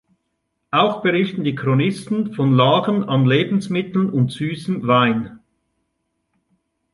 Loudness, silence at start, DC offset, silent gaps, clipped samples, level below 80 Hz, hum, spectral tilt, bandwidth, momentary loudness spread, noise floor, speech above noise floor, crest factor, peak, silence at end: -18 LUFS; 0.75 s; under 0.1%; none; under 0.1%; -60 dBFS; none; -7.5 dB/octave; 11.5 kHz; 8 LU; -73 dBFS; 56 dB; 16 dB; -2 dBFS; 1.55 s